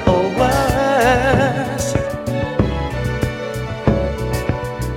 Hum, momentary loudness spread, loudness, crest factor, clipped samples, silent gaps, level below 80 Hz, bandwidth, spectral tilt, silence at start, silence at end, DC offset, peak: none; 8 LU; -18 LUFS; 16 dB; under 0.1%; none; -28 dBFS; 17 kHz; -6 dB/octave; 0 s; 0 s; under 0.1%; 0 dBFS